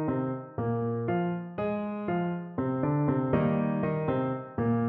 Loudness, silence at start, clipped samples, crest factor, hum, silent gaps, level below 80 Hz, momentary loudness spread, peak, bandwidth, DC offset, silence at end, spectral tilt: -30 LUFS; 0 s; under 0.1%; 16 dB; none; none; -56 dBFS; 6 LU; -12 dBFS; 4.1 kHz; under 0.1%; 0 s; -12 dB/octave